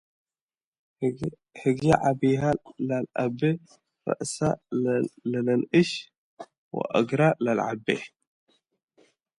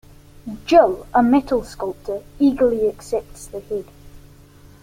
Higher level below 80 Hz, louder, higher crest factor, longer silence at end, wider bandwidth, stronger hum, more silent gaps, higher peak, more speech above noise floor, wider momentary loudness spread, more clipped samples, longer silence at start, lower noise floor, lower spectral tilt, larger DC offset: second, -60 dBFS vs -44 dBFS; second, -26 LUFS vs -19 LUFS; about the same, 22 dB vs 18 dB; first, 1.3 s vs 0.65 s; second, 11.5 kHz vs 16 kHz; neither; first, 6.18-6.37 s, 6.58-6.71 s vs none; second, -6 dBFS vs -2 dBFS; first, over 65 dB vs 27 dB; second, 12 LU vs 19 LU; neither; first, 1 s vs 0.45 s; first, under -90 dBFS vs -46 dBFS; about the same, -6.5 dB/octave vs -6 dB/octave; neither